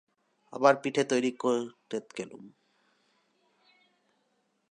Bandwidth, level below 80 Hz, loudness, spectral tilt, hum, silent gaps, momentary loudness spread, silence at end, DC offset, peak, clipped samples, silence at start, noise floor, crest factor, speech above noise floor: 10.5 kHz; -84 dBFS; -29 LUFS; -4.5 dB/octave; none; none; 19 LU; 2.2 s; under 0.1%; -8 dBFS; under 0.1%; 0.5 s; -75 dBFS; 26 dB; 46 dB